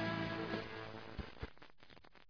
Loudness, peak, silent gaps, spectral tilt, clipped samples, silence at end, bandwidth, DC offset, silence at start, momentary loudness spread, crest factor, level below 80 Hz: -45 LUFS; -26 dBFS; none; -4 dB/octave; under 0.1%; 0.1 s; 5.4 kHz; under 0.1%; 0 s; 21 LU; 20 dB; -58 dBFS